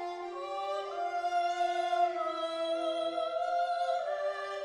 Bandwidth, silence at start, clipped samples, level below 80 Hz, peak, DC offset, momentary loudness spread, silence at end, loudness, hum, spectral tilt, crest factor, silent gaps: 10.5 kHz; 0 s; under 0.1%; -78 dBFS; -18 dBFS; under 0.1%; 6 LU; 0 s; -33 LUFS; none; -2 dB/octave; 14 dB; none